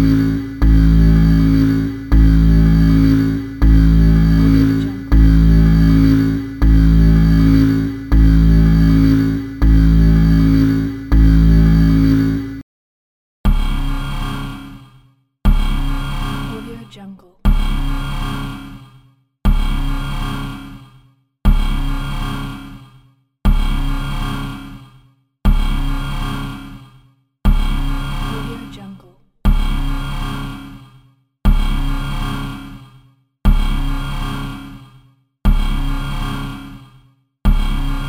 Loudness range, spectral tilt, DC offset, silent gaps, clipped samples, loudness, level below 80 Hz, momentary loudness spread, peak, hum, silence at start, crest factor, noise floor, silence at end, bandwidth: 12 LU; -8 dB/octave; under 0.1%; 12.63-13.44 s; under 0.1%; -16 LUFS; -16 dBFS; 17 LU; 0 dBFS; none; 0 s; 14 dB; -51 dBFS; 0 s; 18 kHz